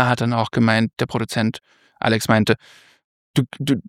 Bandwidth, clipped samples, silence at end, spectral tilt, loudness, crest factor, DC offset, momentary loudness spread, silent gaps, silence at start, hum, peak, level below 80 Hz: 16 kHz; under 0.1%; 0.05 s; -6 dB/octave; -20 LUFS; 20 dB; under 0.1%; 7 LU; 3.04-3.34 s; 0 s; none; 0 dBFS; -56 dBFS